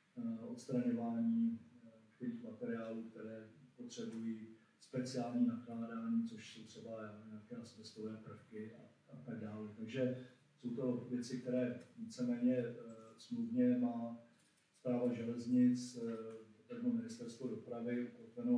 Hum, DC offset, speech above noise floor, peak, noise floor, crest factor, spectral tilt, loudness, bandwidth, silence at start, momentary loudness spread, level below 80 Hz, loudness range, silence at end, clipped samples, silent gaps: none; under 0.1%; 33 dB; -24 dBFS; -73 dBFS; 18 dB; -7 dB/octave; -42 LUFS; 10.5 kHz; 0.15 s; 17 LU; under -90 dBFS; 9 LU; 0 s; under 0.1%; none